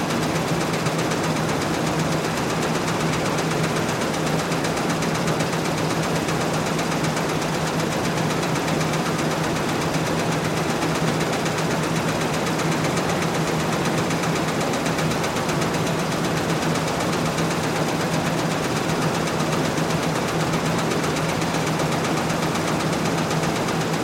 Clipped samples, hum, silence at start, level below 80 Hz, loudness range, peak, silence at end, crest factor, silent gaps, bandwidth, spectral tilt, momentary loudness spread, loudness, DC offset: under 0.1%; none; 0 s; -48 dBFS; 0 LU; -8 dBFS; 0 s; 14 dB; none; 16.5 kHz; -4.5 dB/octave; 1 LU; -22 LUFS; under 0.1%